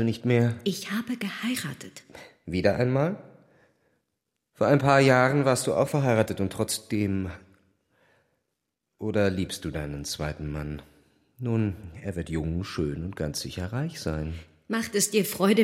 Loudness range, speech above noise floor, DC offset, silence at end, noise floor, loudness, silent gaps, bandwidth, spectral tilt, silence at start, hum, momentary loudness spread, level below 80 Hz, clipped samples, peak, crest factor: 8 LU; 56 dB; under 0.1%; 0 s; -82 dBFS; -27 LUFS; none; 16 kHz; -5.5 dB/octave; 0 s; none; 14 LU; -48 dBFS; under 0.1%; -6 dBFS; 22 dB